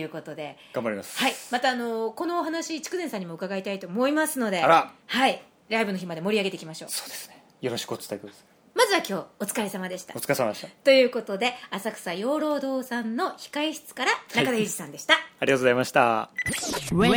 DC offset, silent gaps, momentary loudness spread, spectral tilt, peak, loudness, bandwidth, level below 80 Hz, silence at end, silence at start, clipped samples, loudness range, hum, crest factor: under 0.1%; none; 12 LU; -3.5 dB/octave; -2 dBFS; -26 LUFS; over 20 kHz; -60 dBFS; 0 s; 0 s; under 0.1%; 5 LU; none; 24 dB